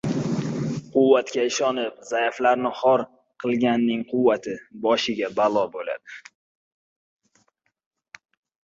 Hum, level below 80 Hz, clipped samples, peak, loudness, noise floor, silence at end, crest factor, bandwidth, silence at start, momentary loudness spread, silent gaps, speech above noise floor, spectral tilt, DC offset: none; -64 dBFS; under 0.1%; -4 dBFS; -23 LUFS; -69 dBFS; 2.45 s; 20 dB; 7.8 kHz; 0.05 s; 12 LU; none; 46 dB; -5 dB/octave; under 0.1%